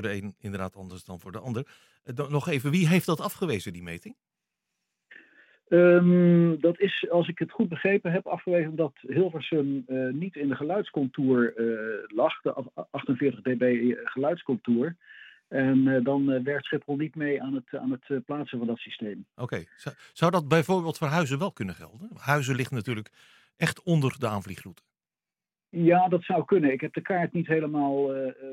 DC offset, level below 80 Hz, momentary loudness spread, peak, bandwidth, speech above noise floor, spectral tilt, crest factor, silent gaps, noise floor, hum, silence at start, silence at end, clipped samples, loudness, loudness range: under 0.1%; -72 dBFS; 14 LU; -6 dBFS; 16.5 kHz; over 64 dB; -7 dB/octave; 20 dB; none; under -90 dBFS; none; 0 s; 0 s; under 0.1%; -27 LUFS; 6 LU